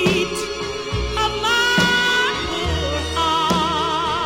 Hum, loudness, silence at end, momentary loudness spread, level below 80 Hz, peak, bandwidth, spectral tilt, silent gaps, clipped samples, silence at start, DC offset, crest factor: none; -19 LUFS; 0 s; 9 LU; -34 dBFS; -4 dBFS; 17 kHz; -3.5 dB/octave; none; under 0.1%; 0 s; under 0.1%; 16 dB